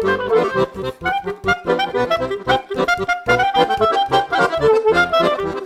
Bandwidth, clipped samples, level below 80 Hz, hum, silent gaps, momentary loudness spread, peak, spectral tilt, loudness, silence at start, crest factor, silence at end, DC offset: 15 kHz; under 0.1%; -44 dBFS; none; none; 7 LU; -2 dBFS; -5 dB/octave; -17 LUFS; 0 s; 14 dB; 0 s; under 0.1%